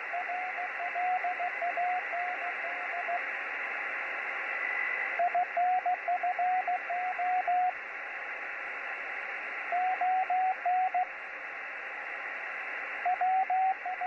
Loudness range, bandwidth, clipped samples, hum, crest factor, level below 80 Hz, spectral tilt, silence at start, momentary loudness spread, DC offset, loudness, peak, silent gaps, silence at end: 3 LU; 6.6 kHz; under 0.1%; none; 12 dB; -80 dBFS; -2 dB/octave; 0 s; 8 LU; under 0.1%; -32 LUFS; -20 dBFS; none; 0 s